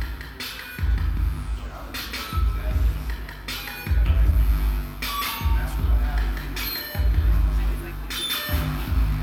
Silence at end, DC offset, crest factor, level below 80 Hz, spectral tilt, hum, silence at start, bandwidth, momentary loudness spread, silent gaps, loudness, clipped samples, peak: 0 s; under 0.1%; 14 dB; -24 dBFS; -5 dB/octave; none; 0 s; 17 kHz; 10 LU; none; -26 LUFS; under 0.1%; -8 dBFS